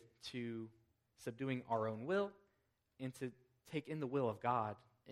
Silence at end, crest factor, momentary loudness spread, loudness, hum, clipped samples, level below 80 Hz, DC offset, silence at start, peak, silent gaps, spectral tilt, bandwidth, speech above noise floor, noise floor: 0 s; 20 dB; 12 LU; -43 LUFS; none; under 0.1%; -82 dBFS; under 0.1%; 0.05 s; -22 dBFS; none; -6.5 dB/octave; 15 kHz; 41 dB; -82 dBFS